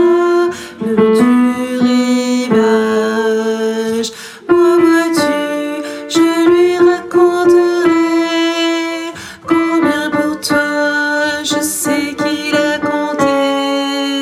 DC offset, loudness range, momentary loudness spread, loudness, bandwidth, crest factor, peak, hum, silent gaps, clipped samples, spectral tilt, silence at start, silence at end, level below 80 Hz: under 0.1%; 3 LU; 7 LU; -13 LUFS; 15 kHz; 12 dB; 0 dBFS; none; none; under 0.1%; -4 dB/octave; 0 s; 0 s; -56 dBFS